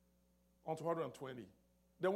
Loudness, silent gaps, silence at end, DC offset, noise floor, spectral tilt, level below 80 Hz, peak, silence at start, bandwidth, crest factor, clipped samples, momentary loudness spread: -44 LUFS; none; 0 s; under 0.1%; -75 dBFS; -6.5 dB/octave; -80 dBFS; -26 dBFS; 0.65 s; 15.5 kHz; 18 dB; under 0.1%; 13 LU